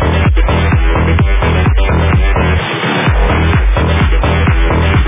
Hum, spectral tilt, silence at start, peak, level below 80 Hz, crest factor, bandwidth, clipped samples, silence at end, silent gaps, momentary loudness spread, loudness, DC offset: none; -10.5 dB/octave; 0 s; 0 dBFS; -12 dBFS; 10 dB; 3.8 kHz; under 0.1%; 0 s; none; 1 LU; -12 LUFS; under 0.1%